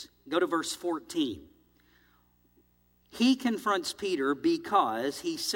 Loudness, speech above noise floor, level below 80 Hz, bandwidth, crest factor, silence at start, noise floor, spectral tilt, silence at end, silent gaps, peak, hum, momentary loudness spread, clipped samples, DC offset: -29 LUFS; 38 dB; -70 dBFS; 17 kHz; 20 dB; 0 s; -67 dBFS; -3 dB/octave; 0 s; none; -12 dBFS; 60 Hz at -55 dBFS; 7 LU; under 0.1%; under 0.1%